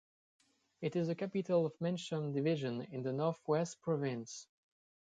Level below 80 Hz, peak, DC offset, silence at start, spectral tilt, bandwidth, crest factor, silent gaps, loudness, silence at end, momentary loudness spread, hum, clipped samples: -80 dBFS; -22 dBFS; under 0.1%; 0.8 s; -6.5 dB/octave; 9.2 kHz; 16 dB; none; -37 LUFS; 0.7 s; 7 LU; none; under 0.1%